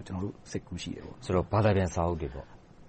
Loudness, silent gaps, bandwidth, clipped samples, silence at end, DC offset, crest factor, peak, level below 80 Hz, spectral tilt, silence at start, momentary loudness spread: -31 LUFS; none; 8.4 kHz; under 0.1%; 0.05 s; under 0.1%; 18 dB; -14 dBFS; -48 dBFS; -6.5 dB/octave; 0 s; 14 LU